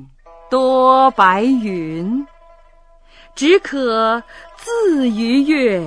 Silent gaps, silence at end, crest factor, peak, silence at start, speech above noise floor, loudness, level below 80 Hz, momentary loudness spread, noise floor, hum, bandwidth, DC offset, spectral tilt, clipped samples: none; 0 s; 16 dB; 0 dBFS; 0 s; 32 dB; -15 LUFS; -48 dBFS; 12 LU; -46 dBFS; none; 10.5 kHz; under 0.1%; -5 dB/octave; under 0.1%